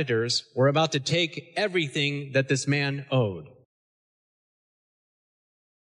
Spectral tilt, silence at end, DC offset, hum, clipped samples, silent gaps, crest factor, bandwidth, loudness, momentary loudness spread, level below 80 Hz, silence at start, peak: -4.5 dB/octave; 2.45 s; under 0.1%; none; under 0.1%; none; 16 dB; 11 kHz; -25 LUFS; 5 LU; -72 dBFS; 0 s; -12 dBFS